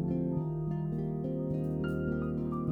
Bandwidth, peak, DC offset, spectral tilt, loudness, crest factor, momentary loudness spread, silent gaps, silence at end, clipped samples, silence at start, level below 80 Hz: 3.1 kHz; -20 dBFS; under 0.1%; -11 dB/octave; -34 LUFS; 12 dB; 2 LU; none; 0 s; under 0.1%; 0 s; -50 dBFS